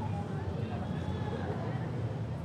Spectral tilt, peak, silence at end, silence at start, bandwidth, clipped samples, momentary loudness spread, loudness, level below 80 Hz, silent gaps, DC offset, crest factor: -8.5 dB/octave; -22 dBFS; 0 s; 0 s; 9.6 kHz; under 0.1%; 1 LU; -36 LUFS; -52 dBFS; none; under 0.1%; 12 dB